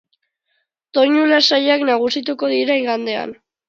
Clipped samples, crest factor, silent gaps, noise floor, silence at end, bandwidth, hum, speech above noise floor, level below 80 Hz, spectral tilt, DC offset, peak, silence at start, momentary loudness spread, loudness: under 0.1%; 18 dB; none; -70 dBFS; 0.35 s; 7.6 kHz; none; 54 dB; -72 dBFS; -3 dB/octave; under 0.1%; 0 dBFS; 0.95 s; 11 LU; -16 LUFS